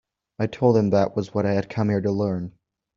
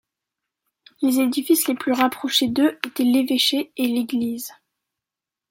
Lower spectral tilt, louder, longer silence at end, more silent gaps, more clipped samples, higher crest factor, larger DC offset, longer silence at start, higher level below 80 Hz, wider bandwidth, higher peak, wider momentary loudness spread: first, -8 dB/octave vs -2.5 dB/octave; second, -23 LUFS vs -20 LUFS; second, 0.45 s vs 1 s; neither; neither; about the same, 18 dB vs 20 dB; neither; second, 0.4 s vs 1 s; first, -58 dBFS vs -68 dBFS; second, 7.2 kHz vs 16.5 kHz; about the same, -4 dBFS vs -2 dBFS; first, 10 LU vs 6 LU